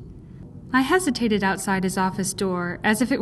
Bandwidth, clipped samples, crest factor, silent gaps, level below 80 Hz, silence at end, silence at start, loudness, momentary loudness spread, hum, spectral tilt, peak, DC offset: 13 kHz; under 0.1%; 16 dB; none; -48 dBFS; 0 s; 0 s; -23 LUFS; 21 LU; none; -4.5 dB/octave; -6 dBFS; under 0.1%